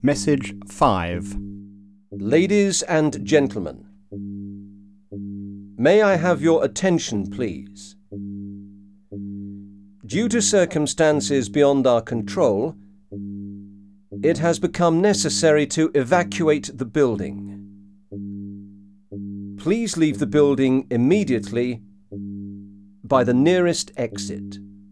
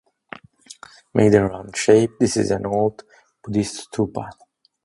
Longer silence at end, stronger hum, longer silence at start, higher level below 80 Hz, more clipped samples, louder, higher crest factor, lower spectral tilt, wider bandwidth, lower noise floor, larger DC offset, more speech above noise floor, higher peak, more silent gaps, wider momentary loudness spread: second, 0.15 s vs 0.5 s; neither; second, 0 s vs 1.15 s; about the same, -50 dBFS vs -50 dBFS; neither; about the same, -20 LUFS vs -20 LUFS; about the same, 18 dB vs 20 dB; about the same, -5 dB/octave vs -5.5 dB/octave; about the same, 11 kHz vs 11.5 kHz; about the same, -46 dBFS vs -45 dBFS; first, 0.1% vs under 0.1%; about the same, 26 dB vs 26 dB; about the same, -2 dBFS vs 0 dBFS; neither; second, 20 LU vs 25 LU